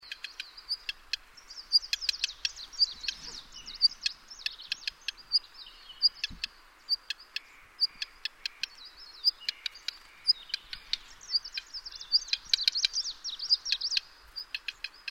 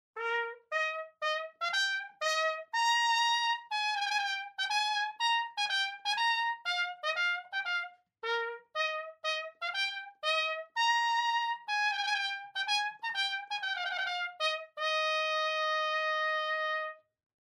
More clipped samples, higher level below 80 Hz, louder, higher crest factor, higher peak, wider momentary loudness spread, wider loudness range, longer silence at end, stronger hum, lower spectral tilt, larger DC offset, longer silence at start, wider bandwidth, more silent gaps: neither; first, -62 dBFS vs under -90 dBFS; about the same, -30 LUFS vs -31 LUFS; first, 26 dB vs 14 dB; first, -8 dBFS vs -18 dBFS; first, 15 LU vs 6 LU; about the same, 4 LU vs 3 LU; second, 0 s vs 0.65 s; neither; first, 2.5 dB/octave vs 4 dB/octave; neither; about the same, 0.05 s vs 0.15 s; about the same, 16 kHz vs 15 kHz; neither